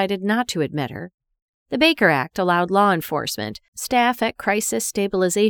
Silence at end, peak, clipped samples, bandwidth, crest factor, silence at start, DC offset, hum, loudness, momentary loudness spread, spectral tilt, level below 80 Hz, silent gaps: 0 s; -2 dBFS; under 0.1%; over 20 kHz; 18 dB; 0 s; under 0.1%; none; -20 LUFS; 12 LU; -4 dB/octave; -56 dBFS; 1.14-1.18 s, 1.42-1.66 s, 3.68-3.73 s